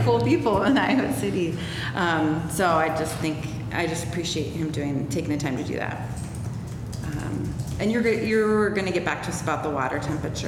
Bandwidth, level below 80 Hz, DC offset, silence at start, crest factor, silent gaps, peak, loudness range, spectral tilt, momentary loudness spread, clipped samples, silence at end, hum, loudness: 16.5 kHz; -44 dBFS; under 0.1%; 0 s; 14 dB; none; -10 dBFS; 5 LU; -5.5 dB/octave; 10 LU; under 0.1%; 0 s; none; -25 LUFS